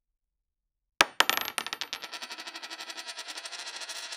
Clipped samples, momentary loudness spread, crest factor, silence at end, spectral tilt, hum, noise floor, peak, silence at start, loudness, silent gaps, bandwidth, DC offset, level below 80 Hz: under 0.1%; 15 LU; 34 dB; 0 s; 0.5 dB/octave; none; -85 dBFS; 0 dBFS; 1 s; -31 LUFS; none; 17.5 kHz; under 0.1%; -72 dBFS